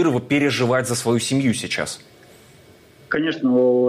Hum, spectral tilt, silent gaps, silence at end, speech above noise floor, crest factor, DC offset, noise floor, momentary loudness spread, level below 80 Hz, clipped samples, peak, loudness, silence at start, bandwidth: none; -5 dB/octave; none; 0 s; 30 dB; 12 dB; under 0.1%; -49 dBFS; 7 LU; -60 dBFS; under 0.1%; -8 dBFS; -20 LUFS; 0 s; 15.5 kHz